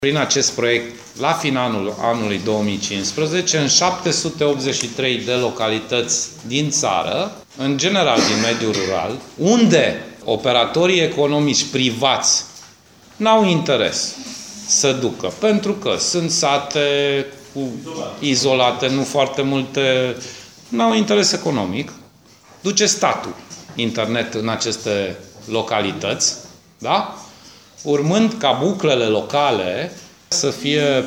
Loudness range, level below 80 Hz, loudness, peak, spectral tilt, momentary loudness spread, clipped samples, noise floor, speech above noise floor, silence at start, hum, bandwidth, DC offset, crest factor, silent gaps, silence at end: 4 LU; -58 dBFS; -18 LUFS; -2 dBFS; -3.5 dB/octave; 12 LU; under 0.1%; -48 dBFS; 30 dB; 0 s; none; 16.5 kHz; under 0.1%; 18 dB; none; 0 s